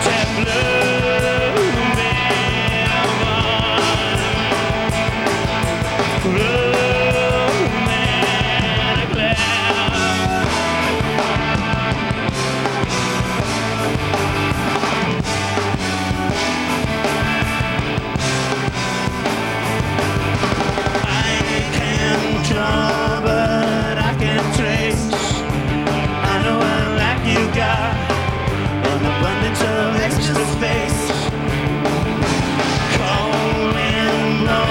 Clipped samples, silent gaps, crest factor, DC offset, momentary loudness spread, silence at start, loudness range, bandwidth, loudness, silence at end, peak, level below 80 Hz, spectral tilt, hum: under 0.1%; none; 14 dB; under 0.1%; 4 LU; 0 s; 3 LU; 18.5 kHz; -18 LUFS; 0 s; -2 dBFS; -32 dBFS; -4.5 dB/octave; none